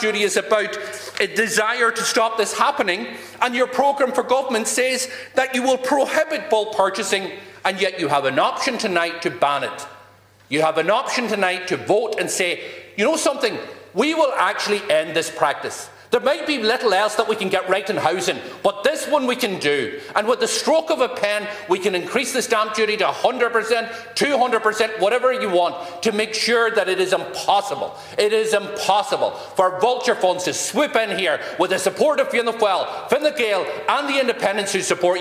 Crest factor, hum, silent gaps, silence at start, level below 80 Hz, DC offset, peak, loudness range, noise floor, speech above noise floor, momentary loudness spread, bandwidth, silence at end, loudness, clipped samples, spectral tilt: 20 dB; none; none; 0 s; -68 dBFS; under 0.1%; 0 dBFS; 2 LU; -49 dBFS; 29 dB; 5 LU; 16 kHz; 0 s; -20 LUFS; under 0.1%; -2.5 dB/octave